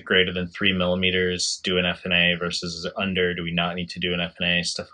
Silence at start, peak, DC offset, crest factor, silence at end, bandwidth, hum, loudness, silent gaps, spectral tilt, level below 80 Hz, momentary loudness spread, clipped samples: 0.05 s; -4 dBFS; under 0.1%; 20 dB; 0.1 s; 10.5 kHz; none; -23 LUFS; none; -3.5 dB/octave; -56 dBFS; 7 LU; under 0.1%